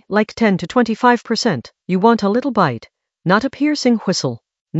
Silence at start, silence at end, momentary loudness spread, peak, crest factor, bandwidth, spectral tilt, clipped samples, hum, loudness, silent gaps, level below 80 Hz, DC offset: 0.1 s; 0 s; 10 LU; 0 dBFS; 16 dB; 8.2 kHz; -5.5 dB/octave; under 0.1%; none; -17 LUFS; 4.61-4.65 s; -56 dBFS; under 0.1%